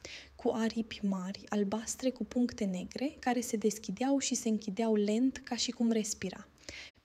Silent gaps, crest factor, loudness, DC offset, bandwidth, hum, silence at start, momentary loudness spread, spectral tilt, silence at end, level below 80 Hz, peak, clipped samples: none; 14 dB; -34 LUFS; under 0.1%; 15 kHz; none; 0.05 s; 8 LU; -4.5 dB/octave; 0.15 s; -64 dBFS; -18 dBFS; under 0.1%